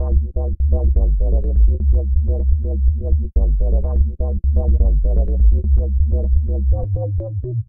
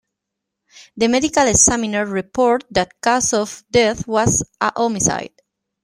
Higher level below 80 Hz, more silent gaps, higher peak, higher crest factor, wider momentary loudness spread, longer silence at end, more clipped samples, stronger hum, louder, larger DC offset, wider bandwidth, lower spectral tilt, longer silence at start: first, -16 dBFS vs -44 dBFS; neither; about the same, -2 dBFS vs 0 dBFS; second, 12 dB vs 18 dB; second, 4 LU vs 9 LU; second, 0.05 s vs 0.55 s; neither; neither; about the same, -19 LUFS vs -17 LUFS; neither; second, 1.1 kHz vs 15 kHz; first, -15.5 dB/octave vs -3 dB/octave; second, 0 s vs 0.75 s